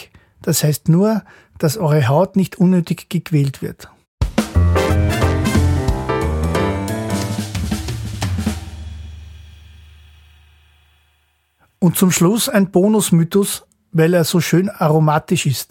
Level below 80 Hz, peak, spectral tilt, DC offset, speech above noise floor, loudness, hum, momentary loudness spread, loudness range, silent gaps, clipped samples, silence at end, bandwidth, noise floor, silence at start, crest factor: -30 dBFS; -2 dBFS; -5.5 dB/octave; under 0.1%; 46 dB; -17 LUFS; none; 11 LU; 11 LU; 4.08-4.18 s; under 0.1%; 0.05 s; 17 kHz; -62 dBFS; 0 s; 16 dB